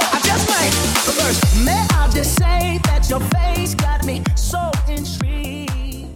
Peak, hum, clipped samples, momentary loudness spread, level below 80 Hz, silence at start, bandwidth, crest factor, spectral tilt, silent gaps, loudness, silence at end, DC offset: -4 dBFS; none; under 0.1%; 8 LU; -20 dBFS; 0 s; 17.5 kHz; 14 dB; -4 dB/octave; none; -17 LUFS; 0 s; under 0.1%